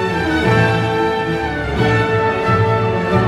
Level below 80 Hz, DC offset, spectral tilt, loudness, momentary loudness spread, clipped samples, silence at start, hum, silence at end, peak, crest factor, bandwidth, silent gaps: -34 dBFS; under 0.1%; -7 dB/octave; -16 LUFS; 5 LU; under 0.1%; 0 s; none; 0 s; -2 dBFS; 12 dB; 13 kHz; none